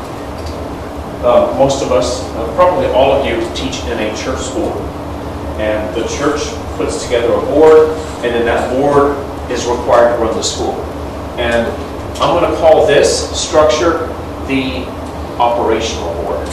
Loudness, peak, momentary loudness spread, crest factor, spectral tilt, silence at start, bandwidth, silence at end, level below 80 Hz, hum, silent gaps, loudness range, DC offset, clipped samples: -14 LUFS; 0 dBFS; 14 LU; 14 dB; -4.5 dB/octave; 0 s; 13.5 kHz; 0 s; -30 dBFS; none; none; 5 LU; 0.3%; 0.4%